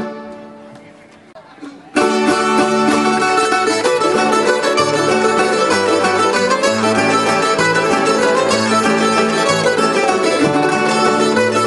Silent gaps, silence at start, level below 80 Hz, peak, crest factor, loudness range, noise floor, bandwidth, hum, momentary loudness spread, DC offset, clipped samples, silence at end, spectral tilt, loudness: none; 0 s; -56 dBFS; 0 dBFS; 14 dB; 2 LU; -41 dBFS; 11.5 kHz; none; 1 LU; under 0.1%; under 0.1%; 0 s; -3.5 dB/octave; -14 LUFS